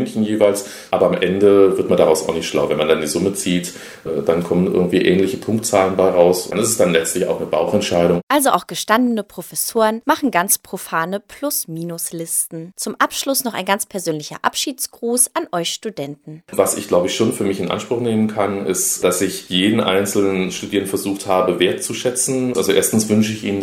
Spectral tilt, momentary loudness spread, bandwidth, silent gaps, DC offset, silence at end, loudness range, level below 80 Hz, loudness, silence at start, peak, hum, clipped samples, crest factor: -4 dB/octave; 9 LU; 19 kHz; 8.23-8.27 s; under 0.1%; 0 s; 4 LU; -54 dBFS; -18 LUFS; 0 s; 0 dBFS; none; under 0.1%; 18 dB